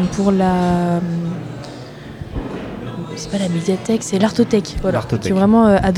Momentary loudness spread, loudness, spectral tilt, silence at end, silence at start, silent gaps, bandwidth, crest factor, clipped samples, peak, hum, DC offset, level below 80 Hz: 17 LU; -18 LUFS; -6.5 dB/octave; 0 s; 0 s; none; 12.5 kHz; 14 dB; under 0.1%; -2 dBFS; none; under 0.1%; -36 dBFS